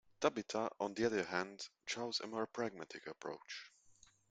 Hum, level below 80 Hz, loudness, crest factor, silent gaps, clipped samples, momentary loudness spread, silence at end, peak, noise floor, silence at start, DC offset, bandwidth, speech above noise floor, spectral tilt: none; -80 dBFS; -42 LUFS; 24 dB; none; under 0.1%; 12 LU; 0.4 s; -18 dBFS; -68 dBFS; 0.2 s; under 0.1%; 9.4 kHz; 27 dB; -3.5 dB/octave